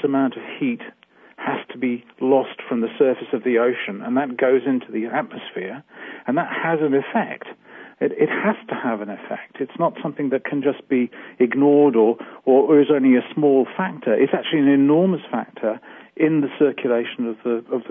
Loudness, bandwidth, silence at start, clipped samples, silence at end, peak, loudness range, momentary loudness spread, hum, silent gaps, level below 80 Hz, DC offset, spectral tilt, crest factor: -20 LUFS; 3.7 kHz; 0 s; under 0.1%; 0 s; -4 dBFS; 7 LU; 15 LU; none; none; -74 dBFS; under 0.1%; -10.5 dB/octave; 16 dB